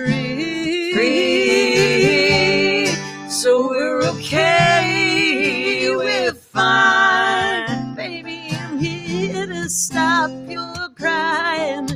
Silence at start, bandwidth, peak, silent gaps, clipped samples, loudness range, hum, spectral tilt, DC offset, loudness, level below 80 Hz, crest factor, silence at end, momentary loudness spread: 0 s; 16.5 kHz; -2 dBFS; none; under 0.1%; 6 LU; none; -3.5 dB/octave; under 0.1%; -17 LUFS; -50 dBFS; 16 dB; 0 s; 12 LU